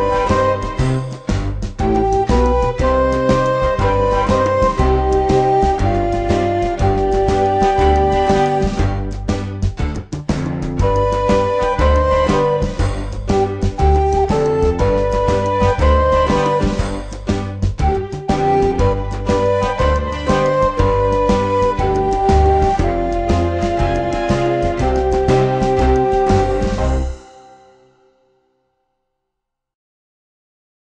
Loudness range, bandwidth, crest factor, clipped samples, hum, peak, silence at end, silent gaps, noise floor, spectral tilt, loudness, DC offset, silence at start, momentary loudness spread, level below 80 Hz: 3 LU; 9.6 kHz; 14 dB; under 0.1%; none; -2 dBFS; 3.55 s; none; -78 dBFS; -7 dB/octave; -16 LUFS; 0.2%; 0 s; 7 LU; -22 dBFS